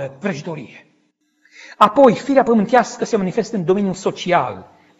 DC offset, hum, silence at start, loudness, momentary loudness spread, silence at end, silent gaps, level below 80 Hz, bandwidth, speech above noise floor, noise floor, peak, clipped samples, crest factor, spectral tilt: under 0.1%; none; 0 s; -17 LUFS; 15 LU; 0.35 s; none; -58 dBFS; 8.4 kHz; 47 dB; -63 dBFS; 0 dBFS; under 0.1%; 18 dB; -6 dB/octave